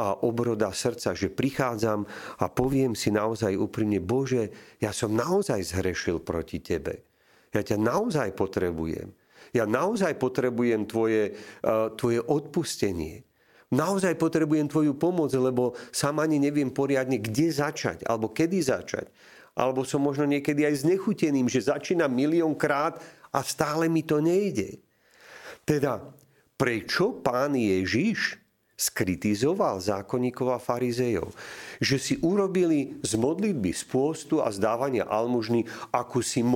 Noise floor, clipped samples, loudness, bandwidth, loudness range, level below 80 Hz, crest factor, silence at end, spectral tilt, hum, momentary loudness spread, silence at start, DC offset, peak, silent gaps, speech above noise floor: -52 dBFS; under 0.1%; -27 LUFS; 17 kHz; 3 LU; -56 dBFS; 22 dB; 0 s; -5.5 dB/octave; none; 7 LU; 0 s; under 0.1%; -6 dBFS; none; 26 dB